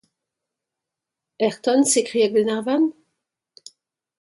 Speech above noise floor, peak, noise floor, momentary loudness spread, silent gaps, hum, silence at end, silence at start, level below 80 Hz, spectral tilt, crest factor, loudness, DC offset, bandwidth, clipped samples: 66 dB; -6 dBFS; -85 dBFS; 7 LU; none; none; 1.3 s; 1.4 s; -74 dBFS; -3 dB/octave; 16 dB; -20 LUFS; under 0.1%; 11.5 kHz; under 0.1%